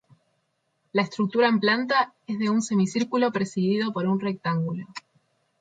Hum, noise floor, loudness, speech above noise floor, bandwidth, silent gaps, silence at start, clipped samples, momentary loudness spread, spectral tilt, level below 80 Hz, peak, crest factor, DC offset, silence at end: none; -73 dBFS; -24 LUFS; 49 dB; 9.2 kHz; none; 0.95 s; under 0.1%; 8 LU; -5.5 dB/octave; -72 dBFS; -10 dBFS; 16 dB; under 0.1%; 0.6 s